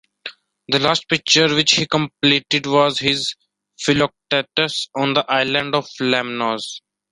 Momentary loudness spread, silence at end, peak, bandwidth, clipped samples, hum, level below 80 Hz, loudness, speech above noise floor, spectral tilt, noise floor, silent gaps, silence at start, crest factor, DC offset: 11 LU; 0.35 s; 0 dBFS; 11.5 kHz; under 0.1%; none; -56 dBFS; -18 LUFS; 20 dB; -3.5 dB/octave; -38 dBFS; none; 0.25 s; 20 dB; under 0.1%